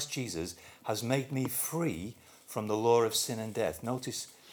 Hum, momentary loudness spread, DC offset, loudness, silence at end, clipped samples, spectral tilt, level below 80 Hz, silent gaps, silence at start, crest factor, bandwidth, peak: none; 14 LU; under 0.1%; -33 LUFS; 0 s; under 0.1%; -4 dB/octave; -64 dBFS; none; 0 s; 20 dB; over 20 kHz; -14 dBFS